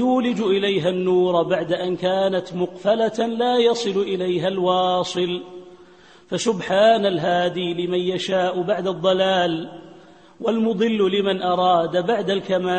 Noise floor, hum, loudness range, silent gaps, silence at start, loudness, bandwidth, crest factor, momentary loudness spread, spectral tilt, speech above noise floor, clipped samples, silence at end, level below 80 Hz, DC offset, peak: -48 dBFS; none; 2 LU; none; 0 s; -20 LUFS; 8.8 kHz; 16 dB; 6 LU; -5.5 dB/octave; 28 dB; under 0.1%; 0 s; -62 dBFS; 0.1%; -6 dBFS